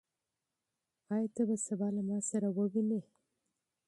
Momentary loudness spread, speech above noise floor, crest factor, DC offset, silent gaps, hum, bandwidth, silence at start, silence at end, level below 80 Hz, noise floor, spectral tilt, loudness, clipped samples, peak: 4 LU; 55 dB; 16 dB; under 0.1%; none; none; 11.5 kHz; 1.1 s; 0.85 s; -82 dBFS; -89 dBFS; -7.5 dB/octave; -35 LUFS; under 0.1%; -22 dBFS